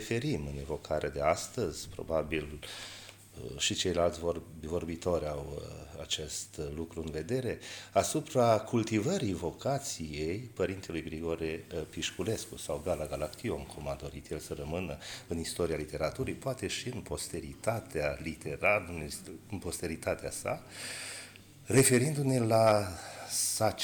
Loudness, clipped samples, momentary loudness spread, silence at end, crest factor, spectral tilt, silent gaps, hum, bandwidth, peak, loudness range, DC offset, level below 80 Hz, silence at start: -33 LUFS; under 0.1%; 13 LU; 0 s; 20 dB; -4.5 dB/octave; none; none; 19.5 kHz; -14 dBFS; 7 LU; under 0.1%; -52 dBFS; 0 s